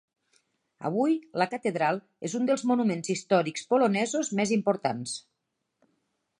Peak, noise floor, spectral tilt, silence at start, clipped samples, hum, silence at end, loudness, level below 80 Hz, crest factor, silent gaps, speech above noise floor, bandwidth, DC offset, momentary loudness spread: -10 dBFS; -81 dBFS; -5 dB/octave; 0.8 s; under 0.1%; none; 1.2 s; -27 LUFS; -78 dBFS; 18 dB; none; 54 dB; 11 kHz; under 0.1%; 9 LU